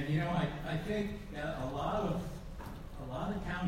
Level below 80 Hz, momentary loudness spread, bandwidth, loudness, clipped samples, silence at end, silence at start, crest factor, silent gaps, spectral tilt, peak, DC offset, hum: -48 dBFS; 13 LU; 16 kHz; -38 LUFS; under 0.1%; 0 s; 0 s; 16 dB; none; -7 dB/octave; -20 dBFS; under 0.1%; none